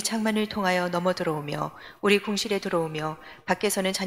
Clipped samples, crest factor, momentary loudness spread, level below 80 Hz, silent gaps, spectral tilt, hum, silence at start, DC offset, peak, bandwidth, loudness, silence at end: under 0.1%; 20 dB; 9 LU; -62 dBFS; none; -4 dB/octave; none; 0 s; under 0.1%; -8 dBFS; 16 kHz; -26 LUFS; 0 s